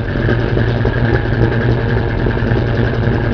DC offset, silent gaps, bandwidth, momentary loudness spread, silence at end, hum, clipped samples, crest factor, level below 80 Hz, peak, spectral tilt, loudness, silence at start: 0.4%; none; 6 kHz; 2 LU; 0 s; none; under 0.1%; 14 dB; -22 dBFS; 0 dBFS; -9 dB/octave; -15 LUFS; 0 s